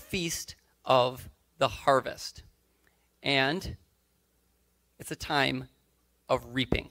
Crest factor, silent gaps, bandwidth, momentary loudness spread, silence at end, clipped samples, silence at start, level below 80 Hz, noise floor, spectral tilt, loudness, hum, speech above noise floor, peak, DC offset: 24 dB; none; 16 kHz; 19 LU; 0.05 s; under 0.1%; 0 s; -52 dBFS; -71 dBFS; -4 dB/octave; -29 LUFS; none; 42 dB; -8 dBFS; under 0.1%